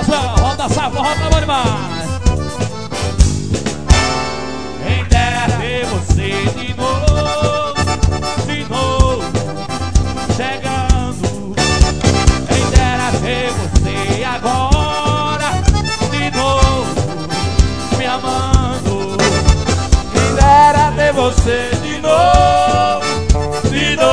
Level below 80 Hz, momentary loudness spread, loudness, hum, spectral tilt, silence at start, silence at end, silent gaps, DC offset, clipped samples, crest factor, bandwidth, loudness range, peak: -20 dBFS; 7 LU; -15 LUFS; none; -5 dB/octave; 0 s; 0 s; none; 3%; 0.3%; 14 dB; 11 kHz; 5 LU; 0 dBFS